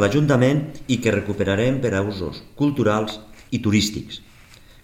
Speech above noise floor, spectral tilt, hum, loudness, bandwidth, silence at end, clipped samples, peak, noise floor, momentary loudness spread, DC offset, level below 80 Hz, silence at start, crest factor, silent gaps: 26 dB; -6 dB/octave; none; -21 LUFS; 16.5 kHz; 0.3 s; under 0.1%; -2 dBFS; -47 dBFS; 14 LU; under 0.1%; -46 dBFS; 0 s; 18 dB; none